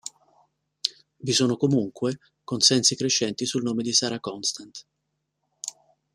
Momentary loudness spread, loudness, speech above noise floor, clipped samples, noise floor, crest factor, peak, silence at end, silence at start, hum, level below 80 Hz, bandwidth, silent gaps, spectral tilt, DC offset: 18 LU; -23 LUFS; 54 dB; under 0.1%; -78 dBFS; 24 dB; -2 dBFS; 0.45 s; 0.05 s; none; -68 dBFS; 14 kHz; none; -3 dB/octave; under 0.1%